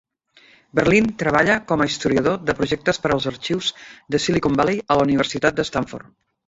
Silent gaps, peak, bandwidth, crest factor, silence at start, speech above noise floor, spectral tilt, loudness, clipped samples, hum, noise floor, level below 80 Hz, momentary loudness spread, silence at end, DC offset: none; -2 dBFS; 8 kHz; 18 dB; 0.75 s; 34 dB; -5 dB/octave; -20 LUFS; under 0.1%; none; -54 dBFS; -48 dBFS; 8 LU; 0.45 s; under 0.1%